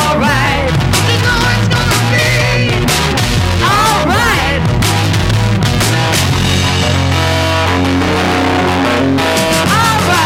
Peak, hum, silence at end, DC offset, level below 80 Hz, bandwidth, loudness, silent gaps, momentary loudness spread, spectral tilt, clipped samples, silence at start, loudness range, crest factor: 0 dBFS; none; 0 s; under 0.1%; -26 dBFS; 16.5 kHz; -11 LUFS; none; 2 LU; -4.5 dB/octave; under 0.1%; 0 s; 1 LU; 12 dB